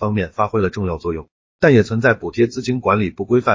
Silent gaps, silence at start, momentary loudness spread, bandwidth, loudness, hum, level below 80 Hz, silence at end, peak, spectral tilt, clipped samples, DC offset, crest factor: 1.31-1.59 s; 0 s; 9 LU; 7.6 kHz; -18 LUFS; none; -40 dBFS; 0 s; -2 dBFS; -7.5 dB/octave; under 0.1%; under 0.1%; 16 dB